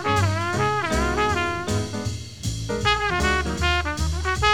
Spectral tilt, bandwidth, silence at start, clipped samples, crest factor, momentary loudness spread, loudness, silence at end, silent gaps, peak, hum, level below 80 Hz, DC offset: -4.5 dB/octave; 16 kHz; 0 s; under 0.1%; 18 dB; 8 LU; -23 LUFS; 0 s; none; -6 dBFS; none; -32 dBFS; 0.6%